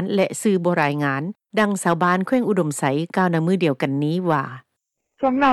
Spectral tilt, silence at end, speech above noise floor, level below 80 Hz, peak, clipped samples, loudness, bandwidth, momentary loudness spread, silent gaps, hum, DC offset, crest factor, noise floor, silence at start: -6 dB/octave; 0 s; 58 dB; -64 dBFS; -6 dBFS; under 0.1%; -21 LUFS; 13.5 kHz; 5 LU; none; none; under 0.1%; 14 dB; -78 dBFS; 0 s